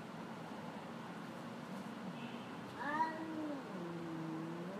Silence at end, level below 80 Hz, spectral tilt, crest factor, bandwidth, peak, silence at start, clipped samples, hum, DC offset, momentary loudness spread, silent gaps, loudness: 0 s; -84 dBFS; -6 dB/octave; 20 dB; 15.5 kHz; -26 dBFS; 0 s; under 0.1%; none; under 0.1%; 9 LU; none; -45 LUFS